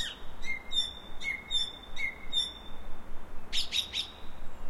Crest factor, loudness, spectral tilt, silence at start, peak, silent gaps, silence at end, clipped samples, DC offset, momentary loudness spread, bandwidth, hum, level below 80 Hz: 16 dB; -33 LUFS; -1 dB/octave; 0 s; -16 dBFS; none; 0 s; under 0.1%; under 0.1%; 19 LU; 12.5 kHz; none; -42 dBFS